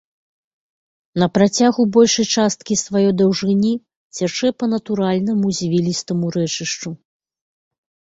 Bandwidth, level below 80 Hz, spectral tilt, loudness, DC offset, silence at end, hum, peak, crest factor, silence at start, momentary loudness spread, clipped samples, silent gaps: 8 kHz; -58 dBFS; -5 dB/octave; -18 LUFS; under 0.1%; 1.25 s; none; -2 dBFS; 16 dB; 1.15 s; 10 LU; under 0.1%; 3.96-4.10 s